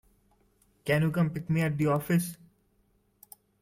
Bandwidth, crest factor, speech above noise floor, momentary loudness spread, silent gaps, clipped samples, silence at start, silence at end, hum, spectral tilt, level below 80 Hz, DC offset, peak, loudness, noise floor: 16.5 kHz; 18 dB; 42 dB; 6 LU; none; under 0.1%; 0.85 s; 1.25 s; none; -7 dB/octave; -62 dBFS; under 0.1%; -14 dBFS; -28 LUFS; -69 dBFS